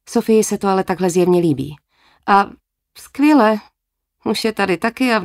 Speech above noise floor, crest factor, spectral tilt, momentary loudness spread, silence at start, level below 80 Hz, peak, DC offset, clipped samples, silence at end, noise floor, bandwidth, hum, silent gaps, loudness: 58 dB; 16 dB; -5 dB/octave; 11 LU; 0.1 s; -54 dBFS; -2 dBFS; under 0.1%; under 0.1%; 0 s; -74 dBFS; 16 kHz; none; none; -16 LUFS